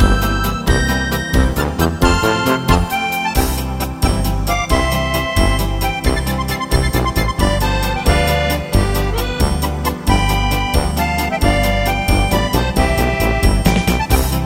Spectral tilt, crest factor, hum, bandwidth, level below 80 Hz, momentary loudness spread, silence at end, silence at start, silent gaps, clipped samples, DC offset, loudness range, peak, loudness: -5 dB/octave; 14 dB; none; 17 kHz; -20 dBFS; 4 LU; 0 s; 0 s; none; under 0.1%; under 0.1%; 2 LU; 0 dBFS; -16 LUFS